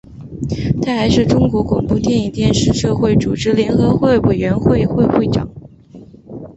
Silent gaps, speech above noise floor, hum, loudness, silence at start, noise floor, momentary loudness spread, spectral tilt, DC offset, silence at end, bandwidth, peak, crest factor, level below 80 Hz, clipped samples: none; 25 dB; none; -15 LUFS; 0.1 s; -39 dBFS; 9 LU; -6.5 dB/octave; under 0.1%; 0.05 s; 8.2 kHz; -2 dBFS; 14 dB; -32 dBFS; under 0.1%